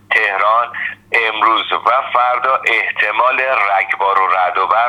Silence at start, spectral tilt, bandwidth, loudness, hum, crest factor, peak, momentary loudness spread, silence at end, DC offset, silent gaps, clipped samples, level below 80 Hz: 0.1 s; -2.5 dB/octave; 12 kHz; -14 LUFS; none; 14 dB; 0 dBFS; 2 LU; 0 s; under 0.1%; none; under 0.1%; -64 dBFS